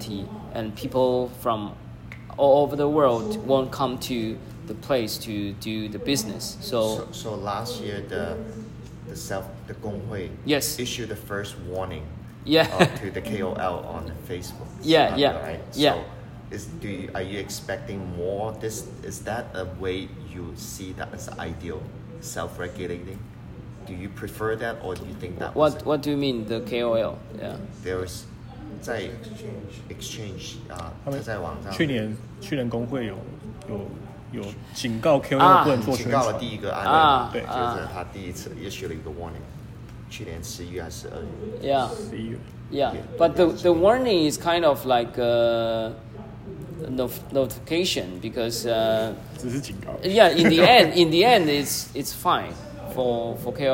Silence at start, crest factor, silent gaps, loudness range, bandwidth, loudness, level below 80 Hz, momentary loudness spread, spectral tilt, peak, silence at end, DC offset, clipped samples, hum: 0 s; 24 dB; none; 14 LU; 16.5 kHz; -24 LUFS; -48 dBFS; 18 LU; -5 dB/octave; -2 dBFS; 0 s; under 0.1%; under 0.1%; none